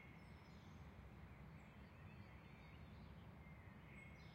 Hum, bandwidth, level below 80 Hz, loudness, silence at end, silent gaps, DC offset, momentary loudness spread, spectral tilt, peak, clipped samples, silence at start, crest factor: none; 16 kHz; -68 dBFS; -61 LUFS; 0 s; none; under 0.1%; 2 LU; -7 dB/octave; -46 dBFS; under 0.1%; 0 s; 14 dB